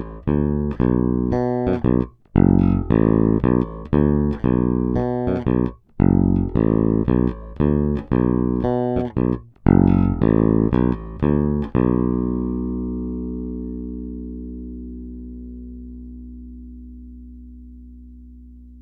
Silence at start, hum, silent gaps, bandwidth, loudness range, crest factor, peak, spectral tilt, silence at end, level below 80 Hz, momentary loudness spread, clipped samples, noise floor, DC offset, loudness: 0 s; 60 Hz at -45 dBFS; none; 4.5 kHz; 17 LU; 20 dB; 0 dBFS; -12 dB/octave; 0 s; -32 dBFS; 19 LU; under 0.1%; -42 dBFS; under 0.1%; -20 LUFS